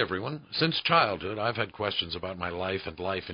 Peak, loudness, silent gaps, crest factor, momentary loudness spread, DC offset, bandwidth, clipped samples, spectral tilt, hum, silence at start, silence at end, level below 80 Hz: -8 dBFS; -29 LUFS; none; 22 dB; 10 LU; under 0.1%; 5.4 kHz; under 0.1%; -9 dB/octave; none; 0 s; 0 s; -54 dBFS